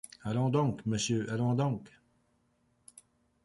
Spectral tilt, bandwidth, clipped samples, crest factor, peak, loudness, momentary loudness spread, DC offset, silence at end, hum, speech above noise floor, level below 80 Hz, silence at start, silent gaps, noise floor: -6 dB/octave; 11.5 kHz; under 0.1%; 18 dB; -16 dBFS; -32 LUFS; 5 LU; under 0.1%; 1.55 s; none; 42 dB; -64 dBFS; 0.25 s; none; -73 dBFS